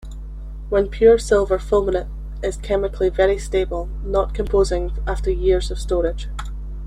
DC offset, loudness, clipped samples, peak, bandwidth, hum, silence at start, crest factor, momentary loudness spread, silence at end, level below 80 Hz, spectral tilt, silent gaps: under 0.1%; -20 LUFS; under 0.1%; -2 dBFS; 11 kHz; none; 0 s; 18 dB; 16 LU; 0 s; -26 dBFS; -6 dB/octave; none